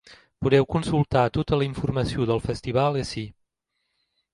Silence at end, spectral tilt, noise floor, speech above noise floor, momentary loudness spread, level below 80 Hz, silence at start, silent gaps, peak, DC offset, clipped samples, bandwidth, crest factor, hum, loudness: 1.05 s; -7 dB/octave; -78 dBFS; 55 dB; 8 LU; -44 dBFS; 0.1 s; none; -6 dBFS; under 0.1%; under 0.1%; 11.5 kHz; 20 dB; none; -24 LUFS